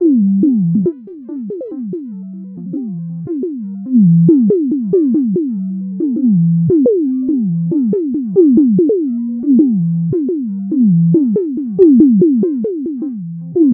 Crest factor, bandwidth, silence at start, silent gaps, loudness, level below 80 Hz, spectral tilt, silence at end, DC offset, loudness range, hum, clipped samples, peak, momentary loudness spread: 12 dB; 1.4 kHz; 0 s; none; -13 LUFS; -58 dBFS; -16.5 dB/octave; 0 s; under 0.1%; 5 LU; none; under 0.1%; 0 dBFS; 15 LU